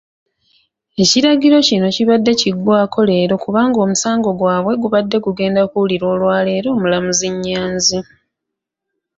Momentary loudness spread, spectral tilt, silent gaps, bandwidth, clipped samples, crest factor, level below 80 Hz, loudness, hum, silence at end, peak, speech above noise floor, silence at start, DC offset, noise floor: 6 LU; -4 dB/octave; none; 8 kHz; under 0.1%; 14 dB; -52 dBFS; -14 LUFS; none; 1.15 s; -2 dBFS; 66 dB; 1 s; under 0.1%; -80 dBFS